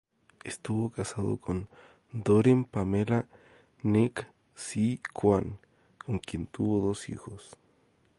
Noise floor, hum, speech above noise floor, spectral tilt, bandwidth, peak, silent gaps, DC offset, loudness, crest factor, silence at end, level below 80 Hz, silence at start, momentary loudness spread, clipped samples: -67 dBFS; none; 38 dB; -7 dB/octave; 11.5 kHz; -10 dBFS; none; under 0.1%; -29 LUFS; 20 dB; 0.7 s; -54 dBFS; 0.45 s; 20 LU; under 0.1%